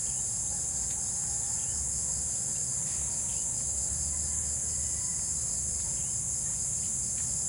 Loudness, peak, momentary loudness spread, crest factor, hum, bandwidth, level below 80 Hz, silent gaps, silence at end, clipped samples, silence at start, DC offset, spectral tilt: -29 LUFS; -18 dBFS; 0 LU; 14 dB; none; 16.5 kHz; -48 dBFS; none; 0 s; under 0.1%; 0 s; under 0.1%; -1.5 dB/octave